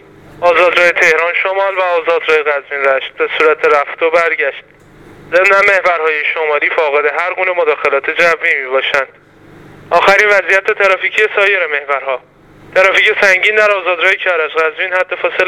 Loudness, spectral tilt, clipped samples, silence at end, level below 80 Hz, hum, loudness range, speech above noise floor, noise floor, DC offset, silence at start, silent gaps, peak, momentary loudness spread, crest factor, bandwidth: -11 LUFS; -2.5 dB/octave; 0.2%; 0 s; -54 dBFS; none; 2 LU; 27 dB; -39 dBFS; under 0.1%; 0.35 s; none; 0 dBFS; 7 LU; 12 dB; 15 kHz